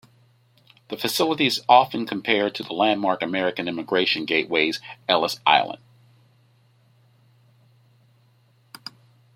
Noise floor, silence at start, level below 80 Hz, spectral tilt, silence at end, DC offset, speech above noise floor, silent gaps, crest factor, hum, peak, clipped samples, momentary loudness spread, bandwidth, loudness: -60 dBFS; 0.9 s; -70 dBFS; -3.5 dB/octave; 3.6 s; under 0.1%; 38 dB; none; 22 dB; none; -2 dBFS; under 0.1%; 17 LU; 16.5 kHz; -21 LUFS